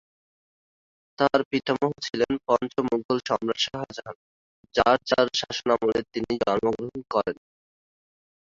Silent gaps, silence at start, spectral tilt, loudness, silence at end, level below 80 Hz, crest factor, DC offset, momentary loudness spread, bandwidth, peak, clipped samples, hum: 1.45-1.51 s, 3.05-3.09 s, 4.15-4.64 s; 1.2 s; -4.5 dB/octave; -25 LUFS; 1.15 s; -58 dBFS; 22 dB; under 0.1%; 11 LU; 7.8 kHz; -6 dBFS; under 0.1%; none